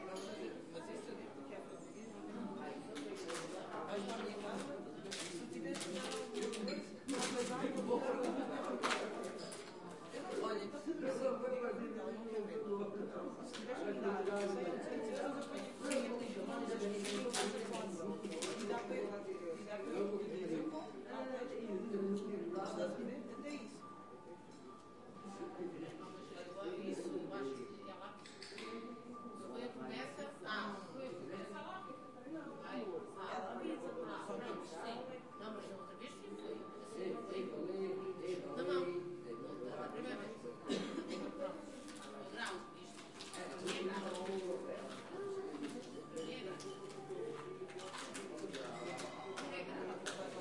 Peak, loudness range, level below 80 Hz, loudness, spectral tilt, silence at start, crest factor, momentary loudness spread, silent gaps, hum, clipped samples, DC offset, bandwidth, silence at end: -22 dBFS; 6 LU; -84 dBFS; -45 LUFS; -4.5 dB/octave; 0 s; 22 dB; 11 LU; none; none; under 0.1%; under 0.1%; 11.5 kHz; 0 s